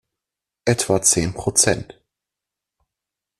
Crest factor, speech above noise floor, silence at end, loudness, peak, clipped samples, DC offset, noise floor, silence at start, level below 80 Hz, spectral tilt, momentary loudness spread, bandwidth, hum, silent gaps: 22 dB; 67 dB; 1.55 s; -18 LUFS; 0 dBFS; under 0.1%; under 0.1%; -86 dBFS; 0.65 s; -48 dBFS; -3 dB/octave; 9 LU; 14 kHz; none; none